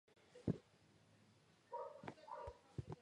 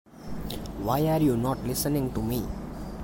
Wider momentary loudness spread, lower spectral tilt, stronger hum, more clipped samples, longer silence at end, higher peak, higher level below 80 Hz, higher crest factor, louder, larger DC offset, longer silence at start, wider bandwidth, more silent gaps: second, 9 LU vs 14 LU; first, -8 dB/octave vs -6 dB/octave; neither; neither; about the same, 0 s vs 0 s; second, -26 dBFS vs -12 dBFS; second, -68 dBFS vs -42 dBFS; first, 26 dB vs 16 dB; second, -51 LUFS vs -28 LUFS; neither; about the same, 0.1 s vs 0.05 s; second, 11 kHz vs 17 kHz; neither